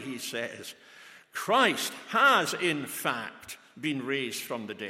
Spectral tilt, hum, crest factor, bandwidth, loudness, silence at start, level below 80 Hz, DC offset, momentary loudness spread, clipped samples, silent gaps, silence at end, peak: -3 dB/octave; none; 22 dB; 16.5 kHz; -28 LUFS; 0 s; -80 dBFS; under 0.1%; 20 LU; under 0.1%; none; 0 s; -8 dBFS